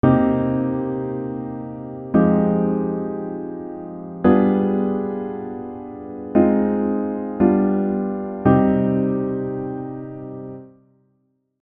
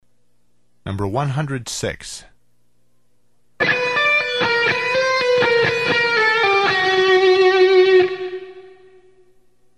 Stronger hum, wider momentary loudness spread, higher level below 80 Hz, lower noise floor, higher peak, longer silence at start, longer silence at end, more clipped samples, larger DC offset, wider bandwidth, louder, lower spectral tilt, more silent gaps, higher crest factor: second, none vs 60 Hz at -55 dBFS; about the same, 16 LU vs 16 LU; about the same, -50 dBFS vs -52 dBFS; about the same, -67 dBFS vs -67 dBFS; about the same, -2 dBFS vs -4 dBFS; second, 0.05 s vs 0.85 s; second, 0.95 s vs 1.1 s; neither; second, under 0.1% vs 0.2%; second, 3.8 kHz vs 12 kHz; second, -20 LUFS vs -16 LUFS; first, -12.5 dB/octave vs -4.5 dB/octave; neither; about the same, 18 dB vs 16 dB